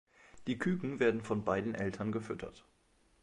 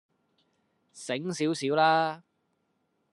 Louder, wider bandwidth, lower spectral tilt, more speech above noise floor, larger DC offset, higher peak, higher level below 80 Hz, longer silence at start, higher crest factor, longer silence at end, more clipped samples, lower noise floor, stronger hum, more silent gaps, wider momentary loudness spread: second, -36 LUFS vs -27 LUFS; about the same, 11.5 kHz vs 11.5 kHz; first, -7 dB/octave vs -4.5 dB/octave; second, 35 dB vs 48 dB; neither; second, -18 dBFS vs -10 dBFS; first, -64 dBFS vs -82 dBFS; second, 0.35 s vs 0.95 s; about the same, 20 dB vs 22 dB; second, 0.6 s vs 0.95 s; neither; second, -70 dBFS vs -75 dBFS; neither; neither; second, 12 LU vs 17 LU